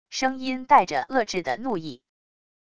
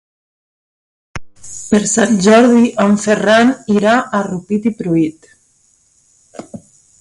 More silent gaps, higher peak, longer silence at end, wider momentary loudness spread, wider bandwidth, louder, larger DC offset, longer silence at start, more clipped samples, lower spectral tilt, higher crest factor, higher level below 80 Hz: neither; second, -4 dBFS vs 0 dBFS; first, 0.65 s vs 0.45 s; second, 12 LU vs 24 LU; second, 10 kHz vs 11.5 kHz; second, -24 LUFS vs -12 LUFS; first, 0.5% vs under 0.1%; second, 0.05 s vs 1.15 s; neither; second, -3.5 dB/octave vs -5 dB/octave; first, 20 dB vs 14 dB; second, -62 dBFS vs -50 dBFS